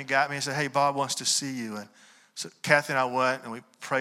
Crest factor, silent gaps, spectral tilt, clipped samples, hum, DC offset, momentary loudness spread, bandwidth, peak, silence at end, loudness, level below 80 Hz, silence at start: 22 dB; none; -2.5 dB/octave; under 0.1%; none; under 0.1%; 16 LU; 16 kHz; -6 dBFS; 0 s; -26 LUFS; -78 dBFS; 0 s